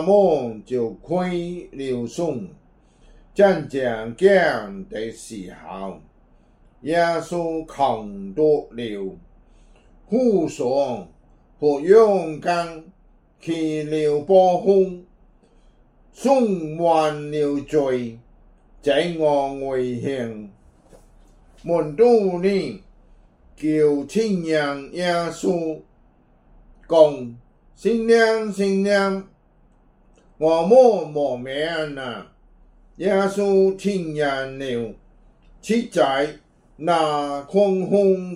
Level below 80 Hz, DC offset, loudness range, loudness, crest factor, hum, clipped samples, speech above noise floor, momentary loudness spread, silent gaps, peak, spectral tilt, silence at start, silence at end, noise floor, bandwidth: -52 dBFS; under 0.1%; 4 LU; -20 LUFS; 20 dB; none; under 0.1%; 36 dB; 16 LU; none; -2 dBFS; -6 dB/octave; 0 s; 0 s; -56 dBFS; 12 kHz